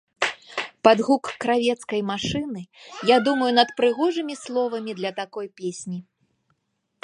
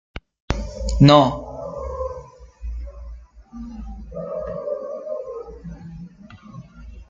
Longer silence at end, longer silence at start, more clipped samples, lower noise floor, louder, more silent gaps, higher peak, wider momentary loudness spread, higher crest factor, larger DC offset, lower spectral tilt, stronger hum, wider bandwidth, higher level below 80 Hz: first, 1 s vs 0.05 s; about the same, 0.2 s vs 0.15 s; neither; first, -74 dBFS vs -43 dBFS; about the same, -23 LUFS vs -21 LUFS; second, none vs 0.40-0.48 s; about the same, -2 dBFS vs -2 dBFS; second, 14 LU vs 26 LU; about the same, 22 dB vs 22 dB; neither; second, -4.5 dB/octave vs -7 dB/octave; neither; first, 11 kHz vs 7.8 kHz; second, -60 dBFS vs -34 dBFS